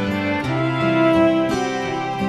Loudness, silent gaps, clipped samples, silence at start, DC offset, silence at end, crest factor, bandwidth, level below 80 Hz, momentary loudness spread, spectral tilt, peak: -19 LUFS; none; under 0.1%; 0 s; under 0.1%; 0 s; 14 dB; 12 kHz; -48 dBFS; 7 LU; -6.5 dB/octave; -6 dBFS